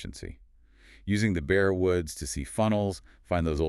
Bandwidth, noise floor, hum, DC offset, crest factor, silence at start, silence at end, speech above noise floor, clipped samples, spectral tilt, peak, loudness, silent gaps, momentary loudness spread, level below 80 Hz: 13.5 kHz; -56 dBFS; none; under 0.1%; 18 dB; 0 s; 0 s; 29 dB; under 0.1%; -6 dB/octave; -10 dBFS; -28 LUFS; none; 17 LU; -42 dBFS